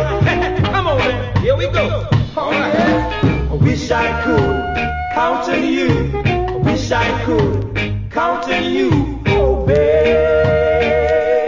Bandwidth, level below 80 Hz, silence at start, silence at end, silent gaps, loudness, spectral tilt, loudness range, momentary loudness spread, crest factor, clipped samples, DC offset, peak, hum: 7.6 kHz; -26 dBFS; 0 s; 0 s; none; -16 LUFS; -7 dB/octave; 2 LU; 4 LU; 14 dB; under 0.1%; under 0.1%; 0 dBFS; none